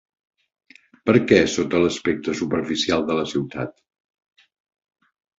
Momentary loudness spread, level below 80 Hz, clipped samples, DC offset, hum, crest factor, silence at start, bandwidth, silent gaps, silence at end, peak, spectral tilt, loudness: 12 LU; -52 dBFS; under 0.1%; under 0.1%; none; 22 dB; 1.05 s; 8 kHz; none; 1.7 s; -2 dBFS; -5 dB/octave; -21 LUFS